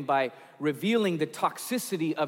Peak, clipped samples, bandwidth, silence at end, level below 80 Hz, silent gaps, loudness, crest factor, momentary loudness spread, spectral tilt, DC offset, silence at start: -12 dBFS; under 0.1%; 17 kHz; 0 s; -86 dBFS; none; -29 LUFS; 16 dB; 6 LU; -5 dB/octave; under 0.1%; 0 s